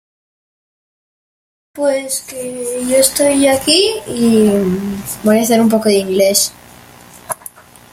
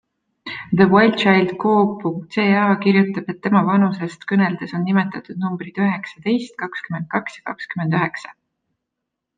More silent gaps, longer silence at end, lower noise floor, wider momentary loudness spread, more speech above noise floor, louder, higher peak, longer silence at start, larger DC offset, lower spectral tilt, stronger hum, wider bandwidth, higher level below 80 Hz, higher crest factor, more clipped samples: neither; second, 0.6 s vs 1.05 s; second, -40 dBFS vs -80 dBFS; about the same, 13 LU vs 14 LU; second, 26 dB vs 62 dB; first, -13 LUFS vs -19 LUFS; about the same, 0 dBFS vs -2 dBFS; first, 1.75 s vs 0.45 s; neither; second, -3.5 dB/octave vs -7.5 dB/octave; first, 60 Hz at -40 dBFS vs none; first, 16.5 kHz vs 7.6 kHz; first, -50 dBFS vs -62 dBFS; about the same, 16 dB vs 18 dB; neither